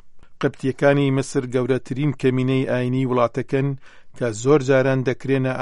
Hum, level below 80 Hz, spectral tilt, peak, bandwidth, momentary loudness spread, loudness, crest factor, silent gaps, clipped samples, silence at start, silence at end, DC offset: none; -54 dBFS; -7 dB/octave; -2 dBFS; 11.5 kHz; 8 LU; -21 LUFS; 18 dB; none; under 0.1%; 0.05 s; 0 s; under 0.1%